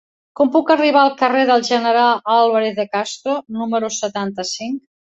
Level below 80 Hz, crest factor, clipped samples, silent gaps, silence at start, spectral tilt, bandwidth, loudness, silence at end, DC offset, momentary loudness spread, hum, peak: -66 dBFS; 16 dB; under 0.1%; none; 0.4 s; -3.5 dB/octave; 8.2 kHz; -17 LUFS; 0.35 s; under 0.1%; 9 LU; none; -2 dBFS